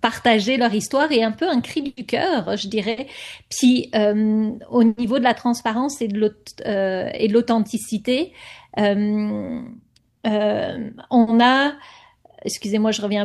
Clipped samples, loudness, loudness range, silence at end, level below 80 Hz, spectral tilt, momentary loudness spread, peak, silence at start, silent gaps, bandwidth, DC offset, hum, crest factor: under 0.1%; -20 LUFS; 3 LU; 0 s; -58 dBFS; -4.5 dB/octave; 12 LU; -2 dBFS; 0.05 s; none; 12.5 kHz; under 0.1%; none; 18 dB